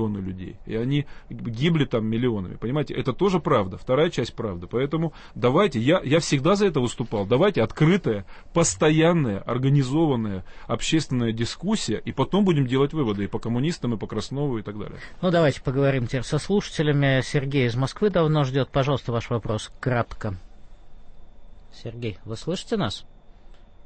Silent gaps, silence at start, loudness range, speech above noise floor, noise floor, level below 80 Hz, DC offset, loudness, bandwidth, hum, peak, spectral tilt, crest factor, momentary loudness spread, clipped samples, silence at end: none; 0 s; 7 LU; 22 dB; -45 dBFS; -44 dBFS; under 0.1%; -24 LUFS; 8.8 kHz; none; -8 dBFS; -6 dB/octave; 16 dB; 11 LU; under 0.1%; 0 s